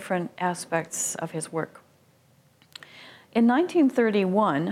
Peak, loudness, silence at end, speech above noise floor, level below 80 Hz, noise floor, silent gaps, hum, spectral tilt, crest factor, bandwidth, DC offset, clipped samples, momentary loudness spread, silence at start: -10 dBFS; -25 LUFS; 0 s; 36 dB; -76 dBFS; -61 dBFS; none; none; -5 dB/octave; 16 dB; 16 kHz; under 0.1%; under 0.1%; 20 LU; 0 s